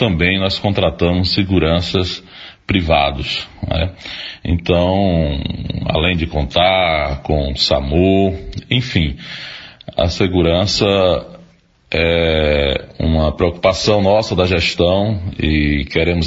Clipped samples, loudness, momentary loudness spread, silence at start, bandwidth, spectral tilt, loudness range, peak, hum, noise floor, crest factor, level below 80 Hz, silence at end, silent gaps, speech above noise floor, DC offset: under 0.1%; -16 LUFS; 9 LU; 0 s; 8 kHz; -6 dB/octave; 3 LU; 0 dBFS; none; -49 dBFS; 16 dB; -28 dBFS; 0 s; none; 33 dB; under 0.1%